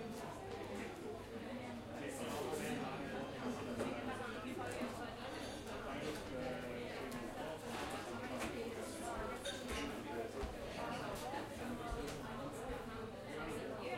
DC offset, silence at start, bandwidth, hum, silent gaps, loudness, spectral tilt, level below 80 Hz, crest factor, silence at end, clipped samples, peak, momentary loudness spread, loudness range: under 0.1%; 0 s; 16 kHz; none; none; -45 LUFS; -4.5 dB/octave; -58 dBFS; 16 dB; 0 s; under 0.1%; -28 dBFS; 5 LU; 1 LU